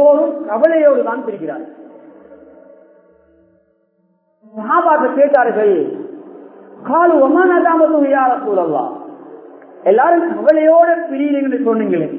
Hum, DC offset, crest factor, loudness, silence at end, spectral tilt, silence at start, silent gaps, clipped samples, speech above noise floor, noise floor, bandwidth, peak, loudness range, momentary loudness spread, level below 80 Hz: none; under 0.1%; 14 dB; -13 LUFS; 0 s; -10 dB/octave; 0 s; none; under 0.1%; 47 dB; -60 dBFS; 4.3 kHz; 0 dBFS; 8 LU; 18 LU; -68 dBFS